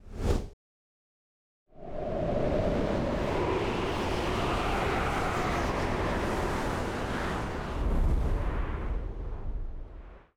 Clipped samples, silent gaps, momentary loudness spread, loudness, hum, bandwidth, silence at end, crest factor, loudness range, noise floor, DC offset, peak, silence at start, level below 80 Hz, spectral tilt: under 0.1%; 0.53-1.66 s; 11 LU; -31 LUFS; none; 14.5 kHz; 0.15 s; 16 dB; 4 LU; under -90 dBFS; under 0.1%; -14 dBFS; 0.05 s; -36 dBFS; -6 dB/octave